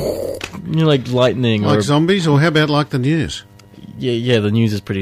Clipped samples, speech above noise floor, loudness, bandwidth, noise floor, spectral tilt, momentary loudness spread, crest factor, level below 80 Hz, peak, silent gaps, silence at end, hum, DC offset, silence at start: under 0.1%; 22 dB; -16 LUFS; 15 kHz; -37 dBFS; -6.5 dB/octave; 11 LU; 12 dB; -46 dBFS; -4 dBFS; none; 0 s; none; under 0.1%; 0 s